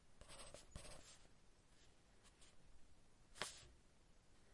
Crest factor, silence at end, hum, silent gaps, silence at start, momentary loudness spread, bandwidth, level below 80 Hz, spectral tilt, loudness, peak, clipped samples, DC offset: 38 dB; 0 s; none; none; 0 s; 17 LU; 11.5 kHz; -70 dBFS; -2 dB/octave; -57 LUFS; -24 dBFS; under 0.1%; under 0.1%